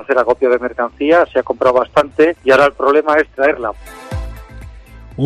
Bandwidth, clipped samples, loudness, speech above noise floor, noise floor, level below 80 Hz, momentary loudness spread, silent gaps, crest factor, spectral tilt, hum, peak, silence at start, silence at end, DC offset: 13 kHz; under 0.1%; -14 LUFS; 22 dB; -36 dBFS; -36 dBFS; 16 LU; none; 14 dB; -6 dB/octave; none; -2 dBFS; 0 s; 0 s; under 0.1%